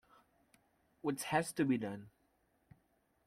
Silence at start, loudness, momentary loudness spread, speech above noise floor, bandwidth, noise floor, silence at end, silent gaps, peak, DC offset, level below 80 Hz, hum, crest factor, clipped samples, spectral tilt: 1.05 s; -37 LUFS; 10 LU; 40 dB; 16 kHz; -77 dBFS; 1.2 s; none; -20 dBFS; under 0.1%; -76 dBFS; none; 22 dB; under 0.1%; -5 dB/octave